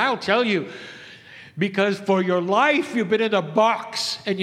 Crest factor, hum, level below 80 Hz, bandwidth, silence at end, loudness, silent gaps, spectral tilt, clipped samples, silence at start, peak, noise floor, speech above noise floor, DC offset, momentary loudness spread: 18 dB; none; -72 dBFS; 14 kHz; 0 s; -21 LUFS; none; -5 dB/octave; under 0.1%; 0 s; -4 dBFS; -44 dBFS; 23 dB; under 0.1%; 20 LU